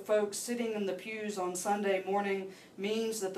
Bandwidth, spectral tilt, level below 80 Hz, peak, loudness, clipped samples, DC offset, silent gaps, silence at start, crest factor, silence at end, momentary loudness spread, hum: 15.5 kHz; -3.5 dB/octave; -82 dBFS; -18 dBFS; -34 LUFS; under 0.1%; under 0.1%; none; 0 s; 16 dB; 0 s; 7 LU; none